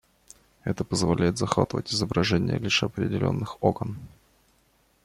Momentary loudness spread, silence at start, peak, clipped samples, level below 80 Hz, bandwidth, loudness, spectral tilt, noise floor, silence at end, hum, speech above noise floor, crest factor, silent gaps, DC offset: 9 LU; 0.65 s; -4 dBFS; under 0.1%; -52 dBFS; 14 kHz; -26 LUFS; -5 dB/octave; -65 dBFS; 0.95 s; none; 39 dB; 22 dB; none; under 0.1%